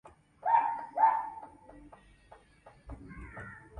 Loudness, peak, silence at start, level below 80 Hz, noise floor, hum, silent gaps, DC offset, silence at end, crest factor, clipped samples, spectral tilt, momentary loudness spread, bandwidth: -30 LUFS; -14 dBFS; 0.45 s; -58 dBFS; -59 dBFS; none; none; under 0.1%; 0 s; 20 dB; under 0.1%; -6.5 dB/octave; 23 LU; 9.8 kHz